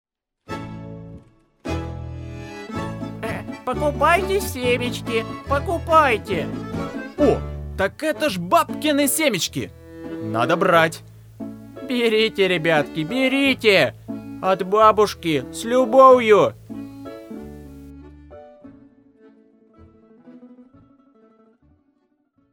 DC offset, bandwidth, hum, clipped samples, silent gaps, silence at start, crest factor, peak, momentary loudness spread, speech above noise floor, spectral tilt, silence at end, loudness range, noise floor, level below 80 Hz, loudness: under 0.1%; over 20 kHz; none; under 0.1%; none; 0.5 s; 22 dB; 0 dBFS; 21 LU; 47 dB; -4.5 dB/octave; 1.9 s; 8 LU; -66 dBFS; -42 dBFS; -19 LUFS